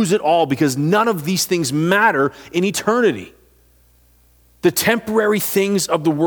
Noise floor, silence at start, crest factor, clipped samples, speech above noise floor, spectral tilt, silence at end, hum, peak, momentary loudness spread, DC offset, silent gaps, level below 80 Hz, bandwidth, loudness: -53 dBFS; 0 s; 18 dB; under 0.1%; 37 dB; -4.5 dB/octave; 0 s; 60 Hz at -50 dBFS; 0 dBFS; 5 LU; under 0.1%; none; -56 dBFS; over 20 kHz; -17 LUFS